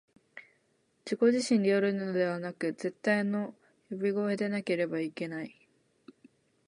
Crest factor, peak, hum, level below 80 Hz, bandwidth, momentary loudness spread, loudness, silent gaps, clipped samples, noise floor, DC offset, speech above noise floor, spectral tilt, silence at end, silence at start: 18 dB; -14 dBFS; none; -82 dBFS; 11 kHz; 19 LU; -31 LUFS; none; under 0.1%; -72 dBFS; under 0.1%; 43 dB; -6 dB/octave; 1.2 s; 0.35 s